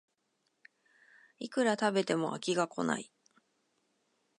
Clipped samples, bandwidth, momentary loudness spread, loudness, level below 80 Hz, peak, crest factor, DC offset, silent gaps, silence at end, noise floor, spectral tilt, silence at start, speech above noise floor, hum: under 0.1%; 11 kHz; 10 LU; -32 LUFS; -88 dBFS; -14 dBFS; 22 dB; under 0.1%; none; 1.35 s; -79 dBFS; -4.5 dB/octave; 1.4 s; 47 dB; none